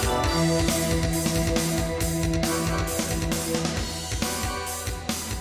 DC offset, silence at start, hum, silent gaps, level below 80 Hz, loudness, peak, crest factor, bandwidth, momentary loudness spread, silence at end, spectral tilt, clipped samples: under 0.1%; 0 s; none; none; -34 dBFS; -25 LUFS; -10 dBFS; 16 dB; 16 kHz; 7 LU; 0 s; -4 dB/octave; under 0.1%